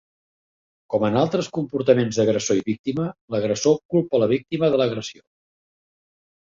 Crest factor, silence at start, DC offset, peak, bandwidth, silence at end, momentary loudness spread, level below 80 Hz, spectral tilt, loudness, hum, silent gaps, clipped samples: 20 dB; 0.9 s; under 0.1%; -2 dBFS; 7.8 kHz; 1.35 s; 7 LU; -60 dBFS; -5.5 dB/octave; -22 LUFS; none; 2.79-2.84 s, 3.21-3.28 s, 3.85-3.89 s; under 0.1%